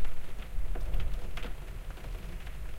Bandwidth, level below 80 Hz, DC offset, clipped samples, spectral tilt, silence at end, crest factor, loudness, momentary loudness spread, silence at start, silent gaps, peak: 13 kHz; -36 dBFS; under 0.1%; under 0.1%; -5.5 dB/octave; 0 s; 14 dB; -42 LUFS; 7 LU; 0 s; none; -16 dBFS